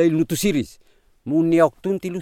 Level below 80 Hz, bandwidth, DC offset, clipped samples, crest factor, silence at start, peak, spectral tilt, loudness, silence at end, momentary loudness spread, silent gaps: -50 dBFS; 17 kHz; under 0.1%; under 0.1%; 18 dB; 0 s; -4 dBFS; -6 dB/octave; -20 LUFS; 0 s; 12 LU; none